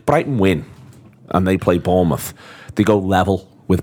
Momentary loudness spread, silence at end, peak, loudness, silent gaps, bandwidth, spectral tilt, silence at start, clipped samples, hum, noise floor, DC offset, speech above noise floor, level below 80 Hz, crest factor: 9 LU; 0 s; 0 dBFS; -18 LUFS; none; 18 kHz; -7 dB/octave; 0.05 s; under 0.1%; none; -43 dBFS; under 0.1%; 26 dB; -42 dBFS; 18 dB